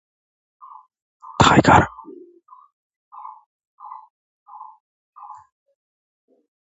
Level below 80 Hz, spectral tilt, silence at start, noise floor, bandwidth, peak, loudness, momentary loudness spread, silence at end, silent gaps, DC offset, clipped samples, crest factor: -44 dBFS; -5 dB/octave; 1.4 s; -49 dBFS; 8 kHz; 0 dBFS; -15 LUFS; 29 LU; 2.1 s; 2.73-2.90 s, 2.96-3.11 s, 3.46-3.60 s, 3.67-3.78 s, 4.10-4.46 s; under 0.1%; under 0.1%; 24 dB